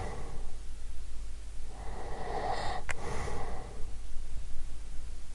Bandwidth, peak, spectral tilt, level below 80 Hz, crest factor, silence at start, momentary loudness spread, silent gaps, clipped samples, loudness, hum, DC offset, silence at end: 11 kHz; -14 dBFS; -4.5 dB/octave; -38 dBFS; 16 dB; 0 s; 11 LU; none; under 0.1%; -42 LUFS; none; under 0.1%; 0 s